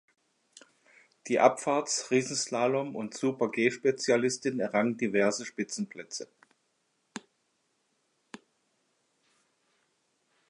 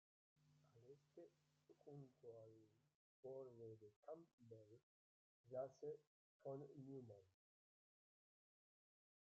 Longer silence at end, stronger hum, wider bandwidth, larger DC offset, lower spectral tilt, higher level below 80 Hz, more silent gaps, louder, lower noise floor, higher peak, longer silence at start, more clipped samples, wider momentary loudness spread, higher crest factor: first, 3.3 s vs 1.95 s; neither; first, 11.5 kHz vs 7.2 kHz; neither; second, -4 dB/octave vs -9 dB/octave; first, -82 dBFS vs under -90 dBFS; second, none vs 2.95-3.23 s, 3.96-4.03 s, 4.33-4.38 s, 4.83-5.44 s, 6.07-6.40 s; first, -29 LUFS vs -60 LUFS; second, -76 dBFS vs under -90 dBFS; first, -6 dBFS vs -40 dBFS; first, 1.25 s vs 0.35 s; neither; first, 18 LU vs 13 LU; about the same, 24 dB vs 22 dB